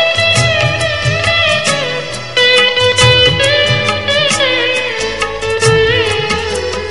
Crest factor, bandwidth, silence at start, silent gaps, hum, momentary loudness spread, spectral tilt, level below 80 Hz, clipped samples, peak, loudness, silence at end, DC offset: 12 dB; 11.5 kHz; 0 s; none; none; 9 LU; -3 dB/octave; -32 dBFS; under 0.1%; 0 dBFS; -11 LUFS; 0 s; 2%